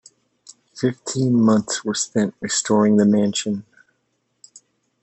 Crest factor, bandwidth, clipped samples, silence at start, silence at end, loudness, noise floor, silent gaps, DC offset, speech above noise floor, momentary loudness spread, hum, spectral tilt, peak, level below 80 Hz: 16 dB; 8.6 kHz; under 0.1%; 0.5 s; 1.4 s; -19 LUFS; -70 dBFS; none; under 0.1%; 52 dB; 9 LU; none; -5 dB/octave; -4 dBFS; -66 dBFS